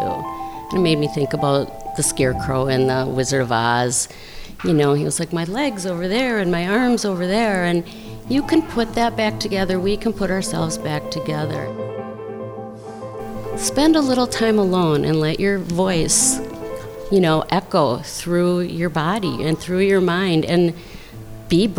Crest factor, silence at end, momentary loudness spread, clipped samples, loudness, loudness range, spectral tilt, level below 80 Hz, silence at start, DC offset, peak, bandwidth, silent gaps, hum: 16 dB; 0 s; 14 LU; under 0.1%; -19 LUFS; 4 LU; -4.5 dB/octave; -40 dBFS; 0 s; 0.1%; -4 dBFS; over 20 kHz; none; none